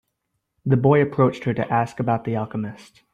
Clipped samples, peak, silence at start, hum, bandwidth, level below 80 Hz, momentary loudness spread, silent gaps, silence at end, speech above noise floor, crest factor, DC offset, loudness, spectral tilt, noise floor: under 0.1%; -6 dBFS; 0.65 s; none; 8.8 kHz; -58 dBFS; 13 LU; none; 0.3 s; 55 dB; 16 dB; under 0.1%; -21 LUFS; -9 dB/octave; -76 dBFS